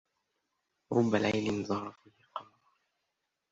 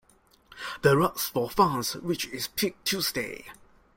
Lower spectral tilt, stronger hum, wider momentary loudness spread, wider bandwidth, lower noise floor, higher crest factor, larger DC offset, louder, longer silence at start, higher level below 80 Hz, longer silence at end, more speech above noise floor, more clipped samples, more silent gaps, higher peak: first, -6 dB/octave vs -4 dB/octave; neither; first, 17 LU vs 14 LU; second, 7.8 kHz vs 16.5 kHz; first, -84 dBFS vs -61 dBFS; about the same, 22 dB vs 22 dB; neither; second, -31 LUFS vs -27 LUFS; first, 0.9 s vs 0.5 s; second, -68 dBFS vs -58 dBFS; first, 1.1 s vs 0.45 s; first, 53 dB vs 34 dB; neither; neither; second, -12 dBFS vs -8 dBFS